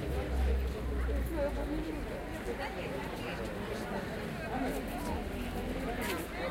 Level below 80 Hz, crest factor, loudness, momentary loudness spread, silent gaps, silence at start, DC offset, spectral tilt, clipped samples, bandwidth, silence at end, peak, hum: -40 dBFS; 14 dB; -37 LUFS; 5 LU; none; 0 s; under 0.1%; -6 dB/octave; under 0.1%; 16.5 kHz; 0 s; -22 dBFS; none